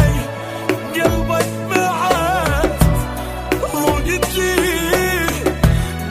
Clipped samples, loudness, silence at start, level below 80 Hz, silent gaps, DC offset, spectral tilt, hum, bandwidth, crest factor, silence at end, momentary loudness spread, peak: under 0.1%; -17 LUFS; 0 s; -26 dBFS; none; under 0.1%; -5 dB/octave; none; 16 kHz; 16 dB; 0 s; 6 LU; 0 dBFS